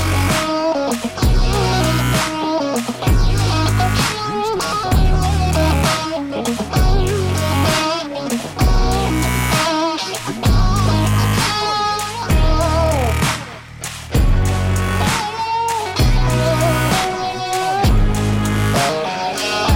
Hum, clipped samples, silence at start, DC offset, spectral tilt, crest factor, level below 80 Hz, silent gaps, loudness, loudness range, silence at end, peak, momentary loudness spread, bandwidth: none; under 0.1%; 0 s; under 0.1%; -5 dB/octave; 10 dB; -22 dBFS; none; -17 LUFS; 1 LU; 0 s; -6 dBFS; 5 LU; 17 kHz